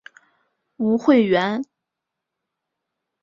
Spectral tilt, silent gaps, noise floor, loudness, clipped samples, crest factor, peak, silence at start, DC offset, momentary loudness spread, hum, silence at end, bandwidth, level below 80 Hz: -7 dB/octave; none; -83 dBFS; -19 LUFS; under 0.1%; 18 dB; -4 dBFS; 0.8 s; under 0.1%; 13 LU; none; 1.6 s; 7.2 kHz; -66 dBFS